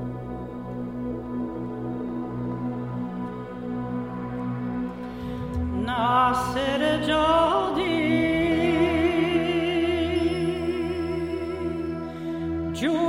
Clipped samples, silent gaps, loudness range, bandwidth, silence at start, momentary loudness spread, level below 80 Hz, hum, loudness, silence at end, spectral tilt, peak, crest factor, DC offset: under 0.1%; none; 9 LU; 14.5 kHz; 0 s; 12 LU; -44 dBFS; none; -26 LUFS; 0 s; -6.5 dB/octave; -8 dBFS; 16 dB; 0.1%